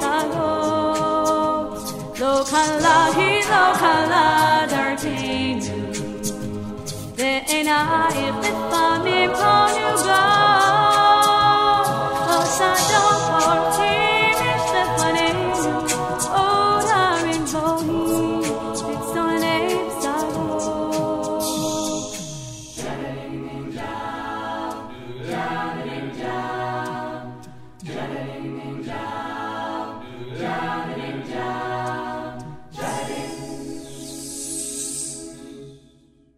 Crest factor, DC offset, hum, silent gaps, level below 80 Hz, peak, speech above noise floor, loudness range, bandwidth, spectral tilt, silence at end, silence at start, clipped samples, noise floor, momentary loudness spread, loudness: 18 dB; under 0.1%; none; none; -50 dBFS; -2 dBFS; 37 dB; 13 LU; 16 kHz; -3.5 dB/octave; 0.6 s; 0 s; under 0.1%; -55 dBFS; 16 LU; -20 LUFS